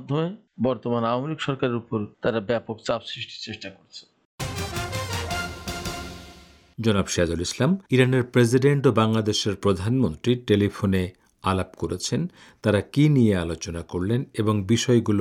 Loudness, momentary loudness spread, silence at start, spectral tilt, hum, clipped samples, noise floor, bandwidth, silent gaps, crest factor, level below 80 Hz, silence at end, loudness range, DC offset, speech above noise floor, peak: -24 LUFS; 13 LU; 0 s; -6 dB/octave; none; under 0.1%; -49 dBFS; 17.5 kHz; 4.25-4.38 s; 18 dB; -50 dBFS; 0 s; 9 LU; under 0.1%; 26 dB; -6 dBFS